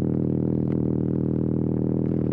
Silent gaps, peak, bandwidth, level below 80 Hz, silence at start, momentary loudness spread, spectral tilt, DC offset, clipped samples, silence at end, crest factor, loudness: none; -12 dBFS; 2.7 kHz; -50 dBFS; 0 s; 0 LU; -13.5 dB/octave; under 0.1%; under 0.1%; 0 s; 12 dB; -24 LUFS